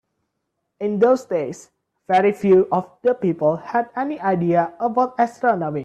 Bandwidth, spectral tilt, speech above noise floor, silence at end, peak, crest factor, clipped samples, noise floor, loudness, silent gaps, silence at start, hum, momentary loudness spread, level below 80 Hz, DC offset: 9 kHz; -7.5 dB/octave; 57 dB; 0 s; -4 dBFS; 16 dB; under 0.1%; -76 dBFS; -20 LUFS; none; 0.8 s; none; 9 LU; -64 dBFS; under 0.1%